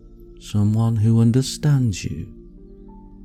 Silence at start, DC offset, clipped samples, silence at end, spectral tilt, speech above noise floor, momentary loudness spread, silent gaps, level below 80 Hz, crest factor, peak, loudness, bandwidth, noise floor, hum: 0.05 s; under 0.1%; under 0.1%; 0 s; -7 dB/octave; 23 dB; 16 LU; none; -44 dBFS; 14 dB; -8 dBFS; -20 LUFS; 13.5 kHz; -42 dBFS; none